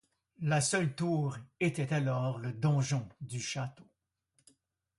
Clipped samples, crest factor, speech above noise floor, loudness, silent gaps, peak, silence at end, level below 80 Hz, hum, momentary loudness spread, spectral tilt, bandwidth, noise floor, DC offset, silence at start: under 0.1%; 16 dB; 45 dB; -33 LUFS; none; -18 dBFS; 1.15 s; -70 dBFS; none; 9 LU; -5 dB/octave; 11.5 kHz; -77 dBFS; under 0.1%; 0.4 s